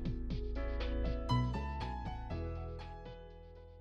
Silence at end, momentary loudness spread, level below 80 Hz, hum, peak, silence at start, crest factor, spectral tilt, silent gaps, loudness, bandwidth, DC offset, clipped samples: 0 s; 18 LU; -42 dBFS; none; -22 dBFS; 0 s; 18 dB; -7.5 dB/octave; none; -40 LUFS; 7.8 kHz; under 0.1%; under 0.1%